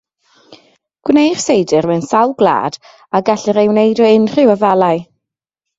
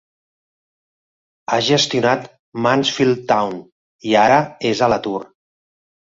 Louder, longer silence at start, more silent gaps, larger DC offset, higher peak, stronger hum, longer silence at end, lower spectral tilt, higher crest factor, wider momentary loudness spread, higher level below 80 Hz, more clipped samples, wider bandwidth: first, -13 LUFS vs -17 LUFS; second, 0.5 s vs 1.5 s; second, none vs 2.39-2.52 s, 3.72-3.99 s; neither; about the same, 0 dBFS vs -2 dBFS; neither; about the same, 0.75 s vs 0.8 s; about the same, -5.5 dB/octave vs -4.5 dB/octave; about the same, 14 dB vs 18 dB; second, 8 LU vs 14 LU; about the same, -56 dBFS vs -58 dBFS; neither; about the same, 8 kHz vs 7.8 kHz